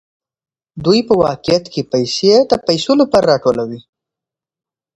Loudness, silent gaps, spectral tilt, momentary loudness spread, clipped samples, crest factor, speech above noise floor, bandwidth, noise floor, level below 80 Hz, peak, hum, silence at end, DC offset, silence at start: -14 LUFS; none; -5.5 dB/octave; 9 LU; under 0.1%; 16 dB; 73 dB; 11 kHz; -86 dBFS; -50 dBFS; 0 dBFS; none; 1.15 s; under 0.1%; 0.75 s